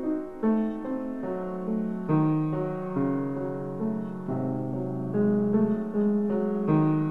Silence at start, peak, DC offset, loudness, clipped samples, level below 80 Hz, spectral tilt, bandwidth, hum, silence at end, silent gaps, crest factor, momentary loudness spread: 0 s; -12 dBFS; 0.4%; -28 LUFS; under 0.1%; -58 dBFS; -11 dB/octave; 3.9 kHz; none; 0 s; none; 14 dB; 8 LU